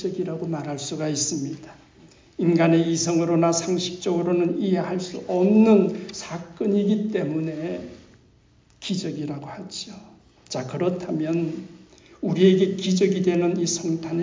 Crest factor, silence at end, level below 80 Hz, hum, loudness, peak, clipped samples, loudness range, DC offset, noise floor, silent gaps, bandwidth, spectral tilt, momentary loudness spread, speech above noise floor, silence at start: 20 dB; 0 s; -62 dBFS; none; -23 LUFS; -4 dBFS; under 0.1%; 9 LU; under 0.1%; -57 dBFS; none; 7.6 kHz; -5.5 dB/octave; 16 LU; 35 dB; 0 s